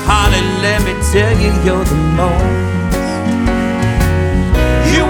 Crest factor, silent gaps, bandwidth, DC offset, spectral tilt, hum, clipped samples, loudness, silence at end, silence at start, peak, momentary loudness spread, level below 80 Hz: 12 dB; none; 18.5 kHz; under 0.1%; -5.5 dB/octave; none; under 0.1%; -13 LUFS; 0 s; 0 s; 0 dBFS; 5 LU; -18 dBFS